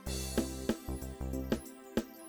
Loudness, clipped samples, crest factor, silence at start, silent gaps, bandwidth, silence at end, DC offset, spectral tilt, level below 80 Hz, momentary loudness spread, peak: -38 LUFS; under 0.1%; 20 dB; 0 s; none; 19.5 kHz; 0 s; under 0.1%; -5 dB/octave; -44 dBFS; 5 LU; -18 dBFS